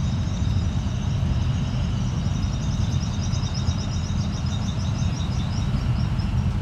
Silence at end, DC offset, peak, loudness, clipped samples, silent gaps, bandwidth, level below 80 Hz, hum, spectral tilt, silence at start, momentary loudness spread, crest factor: 0 s; under 0.1%; -10 dBFS; -25 LUFS; under 0.1%; none; 9.2 kHz; -30 dBFS; none; -6 dB/octave; 0 s; 2 LU; 12 dB